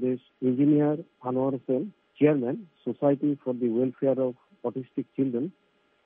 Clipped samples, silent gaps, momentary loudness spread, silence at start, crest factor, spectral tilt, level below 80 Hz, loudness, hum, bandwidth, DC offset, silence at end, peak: under 0.1%; none; 12 LU; 0 s; 18 dB; -9 dB/octave; -78 dBFS; -27 LUFS; none; 3.7 kHz; under 0.1%; 0.55 s; -10 dBFS